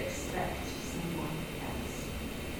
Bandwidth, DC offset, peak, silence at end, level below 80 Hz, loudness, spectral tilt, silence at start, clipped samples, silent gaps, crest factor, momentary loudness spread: 17.5 kHz; under 0.1%; -22 dBFS; 0 s; -46 dBFS; -37 LUFS; -4.5 dB/octave; 0 s; under 0.1%; none; 16 dB; 3 LU